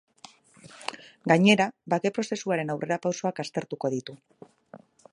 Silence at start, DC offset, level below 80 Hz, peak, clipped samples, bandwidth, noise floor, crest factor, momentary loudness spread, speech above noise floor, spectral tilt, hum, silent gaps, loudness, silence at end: 0.65 s; under 0.1%; -74 dBFS; -4 dBFS; under 0.1%; 11 kHz; -53 dBFS; 24 dB; 17 LU; 27 dB; -5 dB/octave; none; none; -27 LUFS; 0.35 s